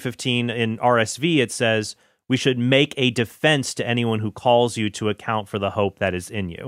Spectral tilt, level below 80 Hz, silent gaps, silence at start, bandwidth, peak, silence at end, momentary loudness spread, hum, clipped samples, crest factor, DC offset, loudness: -5 dB/octave; -58 dBFS; none; 0 s; 16 kHz; -2 dBFS; 0 s; 7 LU; none; under 0.1%; 20 dB; under 0.1%; -21 LUFS